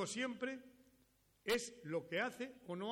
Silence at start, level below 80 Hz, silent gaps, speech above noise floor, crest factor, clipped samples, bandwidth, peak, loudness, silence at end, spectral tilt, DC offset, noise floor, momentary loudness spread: 0 s; -76 dBFS; none; 32 dB; 18 dB; under 0.1%; 17 kHz; -26 dBFS; -43 LUFS; 0 s; -3.5 dB/octave; under 0.1%; -75 dBFS; 9 LU